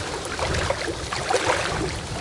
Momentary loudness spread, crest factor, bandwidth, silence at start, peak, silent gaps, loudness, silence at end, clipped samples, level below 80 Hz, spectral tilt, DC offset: 6 LU; 18 dB; 11.5 kHz; 0 s; -8 dBFS; none; -25 LUFS; 0 s; under 0.1%; -38 dBFS; -3.5 dB/octave; under 0.1%